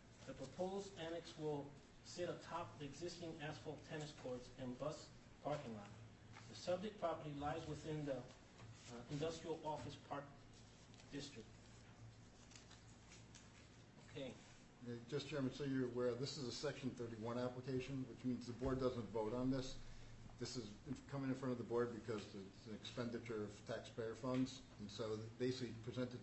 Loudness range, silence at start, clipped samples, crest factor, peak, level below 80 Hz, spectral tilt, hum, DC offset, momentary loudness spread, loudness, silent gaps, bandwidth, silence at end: 11 LU; 0 s; under 0.1%; 20 dB; -28 dBFS; -68 dBFS; -6 dB/octave; none; under 0.1%; 18 LU; -48 LUFS; none; 8.2 kHz; 0 s